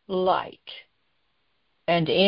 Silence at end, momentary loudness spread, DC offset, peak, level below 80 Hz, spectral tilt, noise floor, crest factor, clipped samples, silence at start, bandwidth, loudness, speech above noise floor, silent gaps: 0 s; 19 LU; under 0.1%; -8 dBFS; -62 dBFS; -10 dB/octave; -73 dBFS; 18 dB; under 0.1%; 0.1 s; 5.6 kHz; -25 LUFS; 50 dB; none